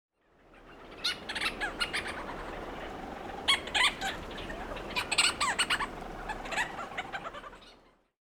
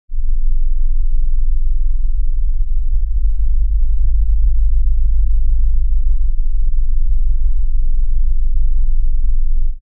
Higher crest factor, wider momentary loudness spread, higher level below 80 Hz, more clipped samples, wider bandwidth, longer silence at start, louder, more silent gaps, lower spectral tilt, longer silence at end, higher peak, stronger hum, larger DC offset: first, 24 dB vs 6 dB; first, 15 LU vs 4 LU; second, -52 dBFS vs -12 dBFS; neither; first, over 20 kHz vs 0.3 kHz; first, 0.5 s vs 0.1 s; second, -32 LUFS vs -21 LUFS; neither; second, -1 dB/octave vs -18 dB/octave; first, 0.5 s vs 0.05 s; second, -12 dBFS vs -4 dBFS; neither; second, under 0.1% vs 2%